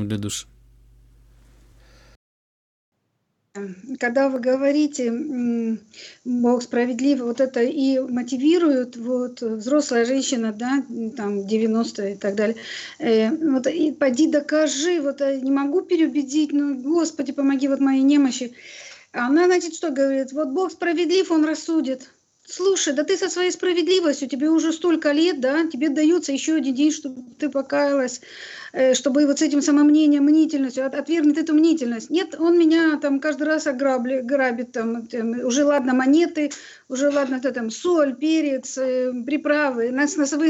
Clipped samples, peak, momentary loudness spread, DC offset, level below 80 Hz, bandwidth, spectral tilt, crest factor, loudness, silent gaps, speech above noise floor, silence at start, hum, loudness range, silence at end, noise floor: under 0.1%; -8 dBFS; 10 LU; under 0.1%; -64 dBFS; 9.6 kHz; -4 dB/octave; 14 dB; -21 LUFS; 2.16-2.92 s; 52 dB; 0 s; none; 4 LU; 0 s; -73 dBFS